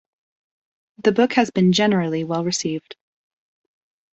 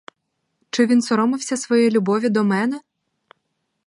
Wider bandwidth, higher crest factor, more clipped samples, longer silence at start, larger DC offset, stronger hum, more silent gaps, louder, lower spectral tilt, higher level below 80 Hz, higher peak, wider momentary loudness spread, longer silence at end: second, 8.2 kHz vs 11.5 kHz; about the same, 20 dB vs 16 dB; neither; first, 1.05 s vs 0.75 s; neither; neither; neither; about the same, -19 LUFS vs -19 LUFS; about the same, -5 dB/octave vs -5 dB/octave; first, -64 dBFS vs -72 dBFS; about the same, -2 dBFS vs -4 dBFS; about the same, 7 LU vs 8 LU; about the same, 1.2 s vs 1.1 s